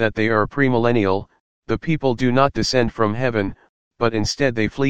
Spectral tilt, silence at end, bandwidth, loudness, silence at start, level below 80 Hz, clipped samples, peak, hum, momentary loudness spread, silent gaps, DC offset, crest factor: -6 dB/octave; 0 s; 9.6 kHz; -20 LUFS; 0 s; -42 dBFS; under 0.1%; -2 dBFS; none; 7 LU; 1.40-1.62 s, 3.69-3.91 s; 2%; 18 dB